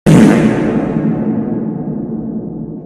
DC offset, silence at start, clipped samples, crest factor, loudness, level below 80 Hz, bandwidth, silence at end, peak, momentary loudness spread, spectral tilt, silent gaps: under 0.1%; 0.05 s; 0.9%; 12 dB; -14 LUFS; -38 dBFS; 13.5 kHz; 0 s; 0 dBFS; 14 LU; -7.5 dB/octave; none